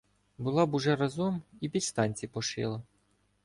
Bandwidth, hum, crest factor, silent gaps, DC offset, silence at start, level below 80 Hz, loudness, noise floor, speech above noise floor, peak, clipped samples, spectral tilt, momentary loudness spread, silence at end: 11.5 kHz; none; 18 dB; none; under 0.1%; 0.4 s; -64 dBFS; -31 LUFS; -71 dBFS; 41 dB; -14 dBFS; under 0.1%; -5 dB/octave; 9 LU; 0.6 s